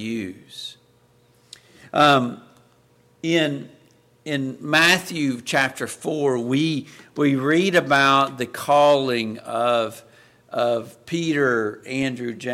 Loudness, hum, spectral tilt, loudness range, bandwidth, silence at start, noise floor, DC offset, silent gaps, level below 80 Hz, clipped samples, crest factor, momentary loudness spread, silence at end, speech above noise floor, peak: -21 LUFS; none; -4.5 dB/octave; 5 LU; 16.5 kHz; 0 s; -58 dBFS; under 0.1%; none; -64 dBFS; under 0.1%; 18 dB; 15 LU; 0 s; 37 dB; -4 dBFS